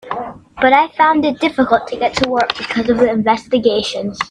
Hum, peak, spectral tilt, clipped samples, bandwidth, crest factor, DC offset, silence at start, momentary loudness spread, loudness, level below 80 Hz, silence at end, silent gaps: none; 0 dBFS; -4.5 dB/octave; under 0.1%; 10.5 kHz; 16 dB; under 0.1%; 0.05 s; 9 LU; -15 LUFS; -46 dBFS; 0.05 s; none